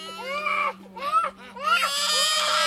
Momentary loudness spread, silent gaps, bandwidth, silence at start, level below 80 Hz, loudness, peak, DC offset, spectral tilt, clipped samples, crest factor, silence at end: 11 LU; none; 18 kHz; 0 s; -68 dBFS; -23 LUFS; -8 dBFS; under 0.1%; 0.5 dB/octave; under 0.1%; 16 dB; 0 s